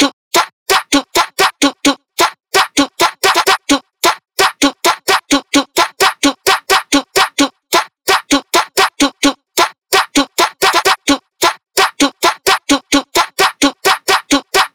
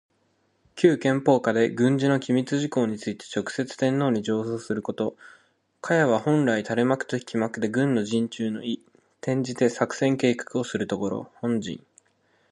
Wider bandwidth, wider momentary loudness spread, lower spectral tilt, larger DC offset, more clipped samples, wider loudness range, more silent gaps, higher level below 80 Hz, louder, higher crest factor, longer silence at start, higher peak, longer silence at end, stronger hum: first, over 20 kHz vs 11.5 kHz; second, 3 LU vs 10 LU; second, -1 dB/octave vs -6 dB/octave; neither; neither; about the same, 1 LU vs 3 LU; first, 0.13-0.31 s, 0.53-0.66 s vs none; first, -46 dBFS vs -66 dBFS; first, -13 LUFS vs -25 LUFS; second, 12 dB vs 20 dB; second, 0 s vs 0.75 s; first, 0 dBFS vs -4 dBFS; second, 0.05 s vs 0.75 s; neither